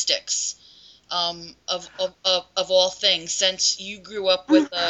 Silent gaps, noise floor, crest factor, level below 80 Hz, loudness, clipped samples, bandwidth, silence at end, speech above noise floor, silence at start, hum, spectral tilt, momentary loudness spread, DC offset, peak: none; -50 dBFS; 20 dB; -64 dBFS; -22 LUFS; under 0.1%; 8.2 kHz; 0 s; 27 dB; 0 s; none; -1 dB/octave; 11 LU; under 0.1%; -4 dBFS